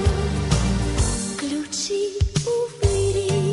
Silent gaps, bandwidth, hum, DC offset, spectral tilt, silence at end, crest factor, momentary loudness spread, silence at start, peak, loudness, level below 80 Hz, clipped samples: none; 11.5 kHz; none; under 0.1%; -5 dB/octave; 0 s; 16 dB; 4 LU; 0 s; -6 dBFS; -23 LUFS; -28 dBFS; under 0.1%